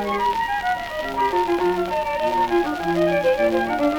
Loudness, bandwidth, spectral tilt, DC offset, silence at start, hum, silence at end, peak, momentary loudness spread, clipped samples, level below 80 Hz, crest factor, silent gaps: -21 LUFS; 19.5 kHz; -5.5 dB/octave; under 0.1%; 0 s; none; 0 s; -6 dBFS; 4 LU; under 0.1%; -46 dBFS; 14 dB; none